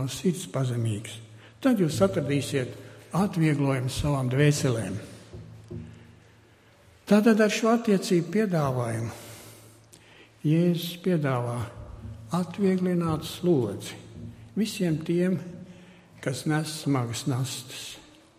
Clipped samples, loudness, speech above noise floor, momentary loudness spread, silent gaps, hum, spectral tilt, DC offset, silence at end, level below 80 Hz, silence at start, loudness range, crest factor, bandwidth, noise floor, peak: under 0.1%; -26 LUFS; 31 dB; 20 LU; none; none; -6 dB/octave; under 0.1%; 0.4 s; -52 dBFS; 0 s; 5 LU; 20 dB; 15.5 kHz; -57 dBFS; -8 dBFS